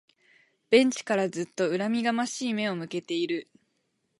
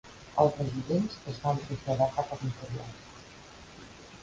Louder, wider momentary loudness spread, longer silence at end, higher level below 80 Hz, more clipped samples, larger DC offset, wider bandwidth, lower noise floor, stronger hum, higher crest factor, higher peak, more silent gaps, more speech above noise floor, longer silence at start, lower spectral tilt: first, -27 LUFS vs -31 LUFS; second, 10 LU vs 22 LU; first, 0.75 s vs 0 s; second, -80 dBFS vs -56 dBFS; neither; neither; first, 11.5 kHz vs 9.2 kHz; first, -75 dBFS vs -50 dBFS; neither; about the same, 22 dB vs 22 dB; first, -6 dBFS vs -10 dBFS; neither; first, 49 dB vs 20 dB; first, 0.7 s vs 0.05 s; second, -4.5 dB/octave vs -7 dB/octave